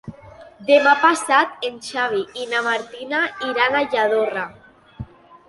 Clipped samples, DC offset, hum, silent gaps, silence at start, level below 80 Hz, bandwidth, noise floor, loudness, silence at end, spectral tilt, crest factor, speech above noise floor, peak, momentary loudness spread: under 0.1%; under 0.1%; none; none; 0.05 s; -56 dBFS; 11.5 kHz; -43 dBFS; -19 LUFS; 0.45 s; -3 dB/octave; 18 dB; 24 dB; -2 dBFS; 20 LU